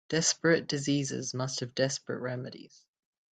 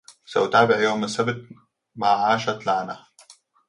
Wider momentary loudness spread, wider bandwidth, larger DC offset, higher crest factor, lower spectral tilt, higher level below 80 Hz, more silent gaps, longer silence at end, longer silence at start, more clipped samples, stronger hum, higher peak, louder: about the same, 12 LU vs 13 LU; second, 9.4 kHz vs 11.5 kHz; neither; about the same, 18 dB vs 20 dB; about the same, -3.5 dB/octave vs -4.5 dB/octave; second, -72 dBFS vs -64 dBFS; neither; first, 0.65 s vs 0.35 s; second, 0.1 s vs 0.3 s; neither; neither; second, -12 dBFS vs -4 dBFS; second, -30 LUFS vs -22 LUFS